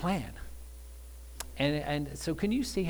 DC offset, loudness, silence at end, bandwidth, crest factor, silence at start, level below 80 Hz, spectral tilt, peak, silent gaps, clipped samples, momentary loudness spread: under 0.1%; -33 LUFS; 0 s; over 20 kHz; 18 dB; 0 s; -46 dBFS; -5.5 dB/octave; -16 dBFS; none; under 0.1%; 18 LU